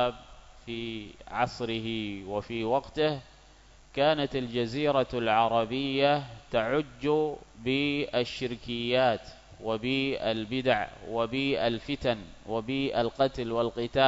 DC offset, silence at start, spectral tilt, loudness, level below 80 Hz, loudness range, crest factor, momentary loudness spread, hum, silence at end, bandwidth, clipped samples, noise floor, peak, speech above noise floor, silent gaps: under 0.1%; 0 s; -6 dB/octave; -29 LUFS; -54 dBFS; 4 LU; 20 dB; 10 LU; none; 0 s; 8 kHz; under 0.1%; -55 dBFS; -10 dBFS; 26 dB; none